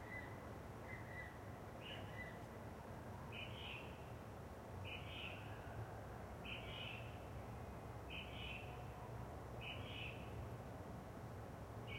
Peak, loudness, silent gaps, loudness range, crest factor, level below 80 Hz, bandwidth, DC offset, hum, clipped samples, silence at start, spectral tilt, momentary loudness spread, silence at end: -36 dBFS; -52 LUFS; none; 1 LU; 16 dB; -62 dBFS; 16 kHz; under 0.1%; none; under 0.1%; 0 s; -5.5 dB/octave; 5 LU; 0 s